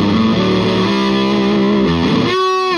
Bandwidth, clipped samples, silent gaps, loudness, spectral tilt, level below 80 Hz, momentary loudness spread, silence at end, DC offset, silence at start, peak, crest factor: 10.5 kHz; under 0.1%; none; -14 LUFS; -6.5 dB/octave; -38 dBFS; 1 LU; 0 s; under 0.1%; 0 s; -2 dBFS; 10 dB